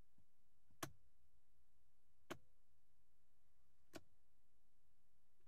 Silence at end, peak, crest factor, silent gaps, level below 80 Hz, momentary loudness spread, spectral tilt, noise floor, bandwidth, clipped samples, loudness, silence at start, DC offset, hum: 1.45 s; -32 dBFS; 36 dB; none; -86 dBFS; 8 LU; -3 dB/octave; -85 dBFS; 3.8 kHz; under 0.1%; -59 LUFS; 0.2 s; 0.2%; none